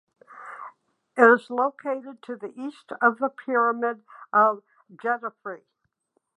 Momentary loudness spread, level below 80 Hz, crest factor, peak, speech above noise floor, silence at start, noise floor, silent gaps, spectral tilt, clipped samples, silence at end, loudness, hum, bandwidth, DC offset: 22 LU; -86 dBFS; 24 dB; -2 dBFS; 50 dB; 0.3 s; -74 dBFS; none; -6 dB/octave; under 0.1%; 0.8 s; -23 LUFS; none; 9.8 kHz; under 0.1%